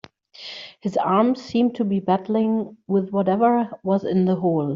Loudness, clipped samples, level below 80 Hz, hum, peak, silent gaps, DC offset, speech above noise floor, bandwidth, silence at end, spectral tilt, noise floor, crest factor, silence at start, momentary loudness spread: -21 LUFS; under 0.1%; -64 dBFS; none; -6 dBFS; none; under 0.1%; 21 dB; 7.4 kHz; 0 s; -7 dB/octave; -41 dBFS; 16 dB; 0.4 s; 11 LU